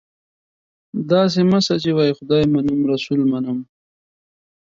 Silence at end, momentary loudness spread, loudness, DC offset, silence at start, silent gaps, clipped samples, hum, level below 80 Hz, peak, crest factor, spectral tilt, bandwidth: 1.15 s; 10 LU; -18 LUFS; under 0.1%; 0.95 s; none; under 0.1%; none; -54 dBFS; -2 dBFS; 18 dB; -6.5 dB/octave; 7.6 kHz